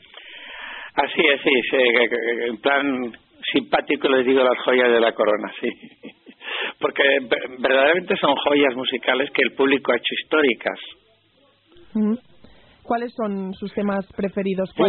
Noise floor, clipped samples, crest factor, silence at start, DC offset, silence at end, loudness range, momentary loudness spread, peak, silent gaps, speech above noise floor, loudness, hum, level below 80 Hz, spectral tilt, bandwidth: -59 dBFS; under 0.1%; 18 dB; 0.15 s; under 0.1%; 0 s; 7 LU; 13 LU; -4 dBFS; none; 39 dB; -20 LUFS; none; -62 dBFS; -2 dB/octave; 4.4 kHz